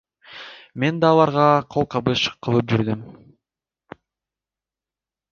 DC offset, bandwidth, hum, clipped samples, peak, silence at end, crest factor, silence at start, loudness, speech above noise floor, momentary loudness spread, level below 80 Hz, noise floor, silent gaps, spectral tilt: under 0.1%; 7.2 kHz; none; under 0.1%; -2 dBFS; 2.2 s; 20 dB; 0.3 s; -20 LUFS; 71 dB; 21 LU; -54 dBFS; -90 dBFS; none; -6.5 dB/octave